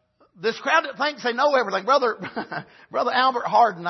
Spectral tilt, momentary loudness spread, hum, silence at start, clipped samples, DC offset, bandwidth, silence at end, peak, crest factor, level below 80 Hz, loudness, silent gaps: -3.5 dB/octave; 12 LU; none; 0.4 s; under 0.1%; under 0.1%; 6.2 kHz; 0 s; -6 dBFS; 16 dB; -76 dBFS; -22 LUFS; none